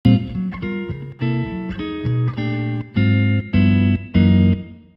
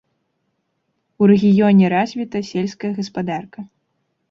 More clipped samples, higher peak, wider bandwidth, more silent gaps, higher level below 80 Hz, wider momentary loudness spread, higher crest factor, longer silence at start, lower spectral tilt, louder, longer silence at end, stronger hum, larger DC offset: neither; about the same, 0 dBFS vs -2 dBFS; second, 5.4 kHz vs 7 kHz; neither; first, -38 dBFS vs -60 dBFS; second, 11 LU vs 14 LU; about the same, 18 dB vs 16 dB; second, 0.05 s vs 1.2 s; first, -10 dB/octave vs -8 dB/octave; about the same, -19 LUFS vs -17 LUFS; second, 0.2 s vs 0.65 s; neither; neither